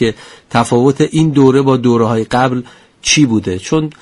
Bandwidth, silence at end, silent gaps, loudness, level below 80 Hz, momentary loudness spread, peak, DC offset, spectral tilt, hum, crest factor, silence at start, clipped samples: 11.5 kHz; 0.1 s; none; -12 LUFS; -44 dBFS; 8 LU; 0 dBFS; under 0.1%; -5 dB/octave; none; 12 dB; 0 s; under 0.1%